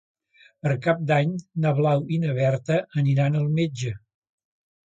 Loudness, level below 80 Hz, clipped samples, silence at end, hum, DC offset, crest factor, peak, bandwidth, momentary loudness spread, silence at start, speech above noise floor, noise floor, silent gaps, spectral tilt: -24 LUFS; -62 dBFS; under 0.1%; 1 s; none; under 0.1%; 16 dB; -8 dBFS; 7.8 kHz; 7 LU; 0.65 s; 30 dB; -53 dBFS; none; -7.5 dB/octave